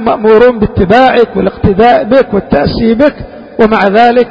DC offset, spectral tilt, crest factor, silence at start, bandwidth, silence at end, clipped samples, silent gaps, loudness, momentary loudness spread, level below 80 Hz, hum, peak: under 0.1%; -8 dB/octave; 8 dB; 0 s; 8 kHz; 0 s; 1%; none; -8 LUFS; 6 LU; -28 dBFS; none; 0 dBFS